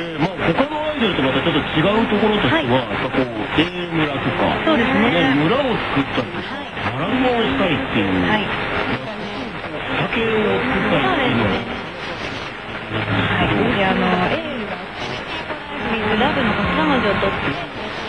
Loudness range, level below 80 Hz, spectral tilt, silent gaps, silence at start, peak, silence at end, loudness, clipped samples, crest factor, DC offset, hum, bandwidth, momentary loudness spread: 2 LU; -40 dBFS; -6.5 dB/octave; none; 0 s; -2 dBFS; 0 s; -19 LUFS; under 0.1%; 18 dB; under 0.1%; none; 10.5 kHz; 10 LU